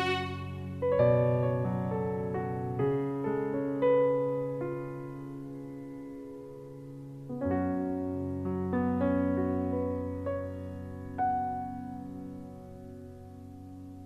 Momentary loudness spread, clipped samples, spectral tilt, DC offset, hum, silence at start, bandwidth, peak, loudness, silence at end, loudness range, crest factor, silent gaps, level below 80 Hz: 19 LU; under 0.1%; -8.5 dB/octave; under 0.1%; none; 0 s; 13 kHz; -14 dBFS; -32 LUFS; 0 s; 8 LU; 18 dB; none; -60 dBFS